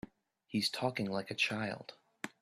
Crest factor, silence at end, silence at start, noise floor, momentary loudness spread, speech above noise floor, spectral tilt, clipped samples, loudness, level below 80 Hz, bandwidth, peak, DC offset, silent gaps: 20 dB; 0.15 s; 0.05 s; -62 dBFS; 15 LU; 26 dB; -4 dB/octave; under 0.1%; -36 LUFS; -74 dBFS; 14.5 kHz; -18 dBFS; under 0.1%; none